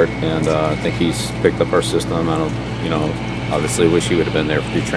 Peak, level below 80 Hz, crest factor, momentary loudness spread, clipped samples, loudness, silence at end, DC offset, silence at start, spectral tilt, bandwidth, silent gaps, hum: 0 dBFS; -34 dBFS; 18 dB; 6 LU; under 0.1%; -18 LUFS; 0 s; under 0.1%; 0 s; -5.5 dB/octave; 11 kHz; none; 60 Hz at -25 dBFS